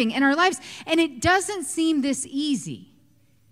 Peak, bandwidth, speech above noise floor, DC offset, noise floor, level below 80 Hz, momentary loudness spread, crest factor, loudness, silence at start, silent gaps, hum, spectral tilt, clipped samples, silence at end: -8 dBFS; 15 kHz; 38 dB; under 0.1%; -61 dBFS; -54 dBFS; 11 LU; 16 dB; -23 LUFS; 0 s; none; none; -3 dB/octave; under 0.1%; 0.65 s